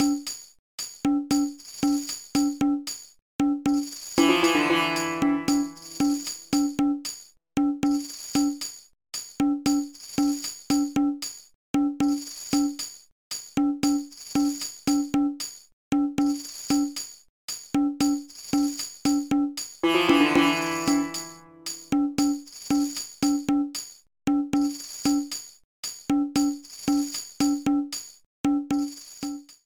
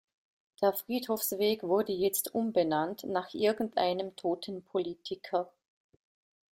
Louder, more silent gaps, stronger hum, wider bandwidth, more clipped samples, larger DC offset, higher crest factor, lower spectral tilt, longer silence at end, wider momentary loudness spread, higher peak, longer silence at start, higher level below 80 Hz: first, -26 LUFS vs -32 LUFS; first, 0.59-0.78 s, 3.22-3.39 s, 11.55-11.74 s, 13.12-13.31 s, 15.73-15.91 s, 17.29-17.48 s, 25.64-25.83 s, 28.26-28.44 s vs none; neither; first, 18.5 kHz vs 16.5 kHz; neither; neither; about the same, 18 dB vs 18 dB; about the same, -3.5 dB/octave vs -4 dB/octave; second, 0.1 s vs 1.05 s; first, 12 LU vs 6 LU; first, -8 dBFS vs -14 dBFS; second, 0 s vs 0.6 s; first, -56 dBFS vs -74 dBFS